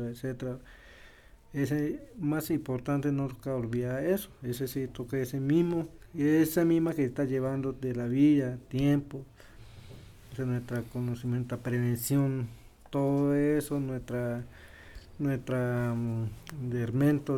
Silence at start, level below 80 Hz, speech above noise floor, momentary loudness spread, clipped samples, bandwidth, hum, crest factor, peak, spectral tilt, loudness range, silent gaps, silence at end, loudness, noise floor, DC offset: 0 s; -54 dBFS; 25 dB; 13 LU; under 0.1%; 18 kHz; none; 16 dB; -14 dBFS; -7.5 dB/octave; 6 LU; none; 0 s; -31 LUFS; -54 dBFS; under 0.1%